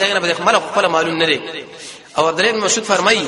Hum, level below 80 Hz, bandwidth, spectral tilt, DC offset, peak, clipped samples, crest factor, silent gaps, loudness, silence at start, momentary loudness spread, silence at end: none; -58 dBFS; 11.5 kHz; -2 dB/octave; under 0.1%; 0 dBFS; under 0.1%; 16 dB; none; -15 LUFS; 0 s; 14 LU; 0 s